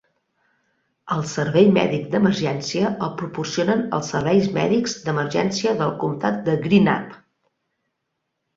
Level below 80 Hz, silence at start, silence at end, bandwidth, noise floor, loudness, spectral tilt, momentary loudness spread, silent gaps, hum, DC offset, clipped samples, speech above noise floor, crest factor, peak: -58 dBFS; 1.05 s; 1.4 s; 7.8 kHz; -77 dBFS; -21 LUFS; -6 dB/octave; 9 LU; none; none; under 0.1%; under 0.1%; 57 dB; 18 dB; -2 dBFS